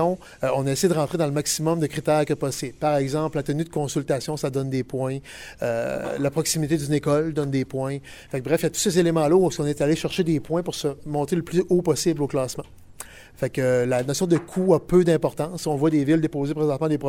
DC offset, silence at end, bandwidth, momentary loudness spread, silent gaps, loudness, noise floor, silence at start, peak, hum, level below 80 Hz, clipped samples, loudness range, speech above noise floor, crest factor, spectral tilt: under 0.1%; 0 s; 16.5 kHz; 9 LU; none; -23 LUFS; -42 dBFS; 0 s; -6 dBFS; none; -50 dBFS; under 0.1%; 4 LU; 20 dB; 18 dB; -5.5 dB/octave